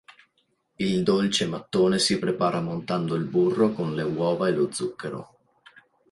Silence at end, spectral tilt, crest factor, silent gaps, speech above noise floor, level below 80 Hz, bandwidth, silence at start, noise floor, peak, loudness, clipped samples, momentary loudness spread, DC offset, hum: 0.85 s; -5 dB/octave; 18 dB; none; 47 dB; -62 dBFS; 11.5 kHz; 0.1 s; -71 dBFS; -8 dBFS; -25 LUFS; under 0.1%; 9 LU; under 0.1%; none